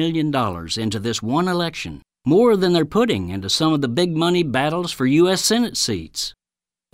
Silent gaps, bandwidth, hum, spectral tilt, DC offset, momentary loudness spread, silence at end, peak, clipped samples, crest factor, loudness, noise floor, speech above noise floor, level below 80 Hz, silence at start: none; 16 kHz; none; -4.5 dB/octave; under 0.1%; 10 LU; 0.65 s; -6 dBFS; under 0.1%; 14 dB; -19 LUFS; under -90 dBFS; over 71 dB; -50 dBFS; 0 s